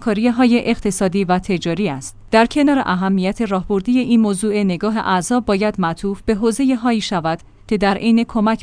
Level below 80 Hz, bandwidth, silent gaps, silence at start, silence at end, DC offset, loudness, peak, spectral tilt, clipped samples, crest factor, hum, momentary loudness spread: -40 dBFS; 10.5 kHz; none; 0 s; 0 s; under 0.1%; -17 LUFS; 0 dBFS; -5.5 dB/octave; under 0.1%; 16 dB; none; 6 LU